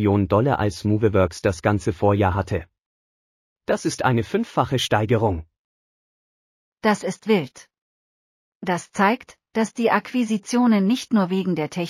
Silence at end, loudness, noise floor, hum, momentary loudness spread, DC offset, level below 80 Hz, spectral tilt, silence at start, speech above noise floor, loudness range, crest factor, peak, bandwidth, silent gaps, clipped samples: 0 s; -22 LUFS; under -90 dBFS; none; 8 LU; under 0.1%; -48 dBFS; -6 dB/octave; 0 s; over 69 dB; 4 LU; 18 dB; -4 dBFS; 15 kHz; 2.80-3.56 s, 5.59-6.72 s, 7.78-8.60 s; under 0.1%